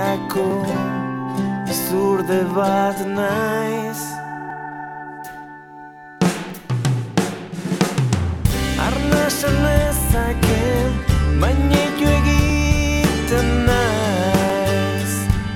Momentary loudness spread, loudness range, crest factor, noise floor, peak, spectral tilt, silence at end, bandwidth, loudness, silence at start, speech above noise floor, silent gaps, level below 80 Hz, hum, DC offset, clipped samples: 13 LU; 8 LU; 16 dB; -39 dBFS; -2 dBFS; -5.5 dB/octave; 0 s; 18 kHz; -19 LUFS; 0 s; 21 dB; none; -26 dBFS; none; under 0.1%; under 0.1%